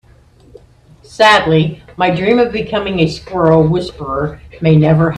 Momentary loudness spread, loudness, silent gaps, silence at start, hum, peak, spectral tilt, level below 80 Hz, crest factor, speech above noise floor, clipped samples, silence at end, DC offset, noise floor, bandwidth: 11 LU; -13 LUFS; none; 1.1 s; none; 0 dBFS; -7 dB/octave; -38 dBFS; 14 dB; 33 dB; under 0.1%; 0 s; under 0.1%; -45 dBFS; 10 kHz